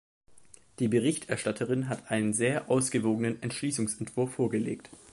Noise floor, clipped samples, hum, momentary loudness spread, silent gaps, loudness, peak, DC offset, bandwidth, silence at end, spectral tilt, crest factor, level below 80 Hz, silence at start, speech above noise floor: -58 dBFS; under 0.1%; none; 6 LU; none; -30 LUFS; -14 dBFS; under 0.1%; 11.5 kHz; 0.15 s; -5 dB/octave; 16 dB; -66 dBFS; 0.3 s; 28 dB